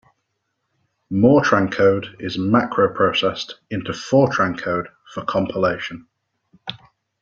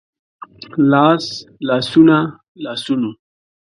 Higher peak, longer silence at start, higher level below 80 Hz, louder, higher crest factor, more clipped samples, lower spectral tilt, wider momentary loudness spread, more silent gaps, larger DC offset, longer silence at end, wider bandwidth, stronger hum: about the same, -2 dBFS vs 0 dBFS; first, 1.1 s vs 0.75 s; first, -54 dBFS vs -60 dBFS; second, -19 LUFS vs -15 LUFS; about the same, 18 dB vs 16 dB; neither; about the same, -6 dB/octave vs -6.5 dB/octave; about the same, 17 LU vs 15 LU; second, none vs 2.48-2.55 s; neither; second, 0.45 s vs 0.65 s; second, 7.6 kHz vs 11 kHz; neither